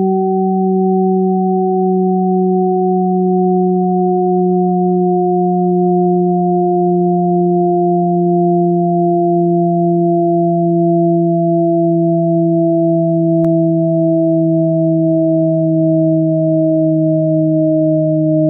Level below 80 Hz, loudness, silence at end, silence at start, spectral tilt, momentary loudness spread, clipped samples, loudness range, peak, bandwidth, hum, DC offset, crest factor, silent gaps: -66 dBFS; -13 LUFS; 0 s; 0 s; -16 dB/octave; 1 LU; under 0.1%; 1 LU; -4 dBFS; 0.9 kHz; none; under 0.1%; 8 dB; none